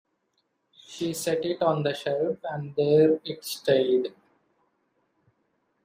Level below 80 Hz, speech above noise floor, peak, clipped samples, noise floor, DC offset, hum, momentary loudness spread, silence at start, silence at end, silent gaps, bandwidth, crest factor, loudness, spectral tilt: -72 dBFS; 50 dB; -8 dBFS; under 0.1%; -74 dBFS; under 0.1%; none; 12 LU; 0.9 s; 1.75 s; none; 15.5 kHz; 18 dB; -26 LUFS; -5.5 dB/octave